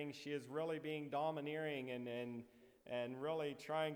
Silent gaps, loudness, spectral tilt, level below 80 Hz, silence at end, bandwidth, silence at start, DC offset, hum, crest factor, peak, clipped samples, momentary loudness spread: none; -45 LUFS; -6 dB/octave; -86 dBFS; 0 s; over 20 kHz; 0 s; under 0.1%; none; 16 dB; -28 dBFS; under 0.1%; 7 LU